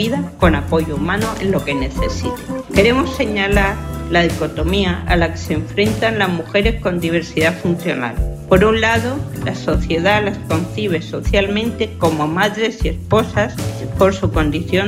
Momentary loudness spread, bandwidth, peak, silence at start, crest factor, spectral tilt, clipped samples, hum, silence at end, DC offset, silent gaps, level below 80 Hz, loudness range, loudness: 7 LU; 16 kHz; 0 dBFS; 0 s; 16 dB; -6 dB/octave; under 0.1%; none; 0 s; under 0.1%; none; -28 dBFS; 1 LU; -17 LUFS